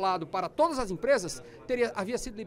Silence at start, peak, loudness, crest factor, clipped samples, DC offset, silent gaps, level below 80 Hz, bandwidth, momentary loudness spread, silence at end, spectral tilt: 0 s; -14 dBFS; -30 LUFS; 16 dB; under 0.1%; under 0.1%; none; -52 dBFS; 16 kHz; 7 LU; 0 s; -4 dB/octave